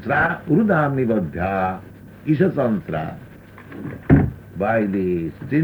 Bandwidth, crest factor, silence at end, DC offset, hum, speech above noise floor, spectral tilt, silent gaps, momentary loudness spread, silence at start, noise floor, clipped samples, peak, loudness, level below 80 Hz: over 20 kHz; 20 dB; 0 s; under 0.1%; none; 21 dB; -10 dB/octave; none; 16 LU; 0 s; -40 dBFS; under 0.1%; -2 dBFS; -20 LUFS; -40 dBFS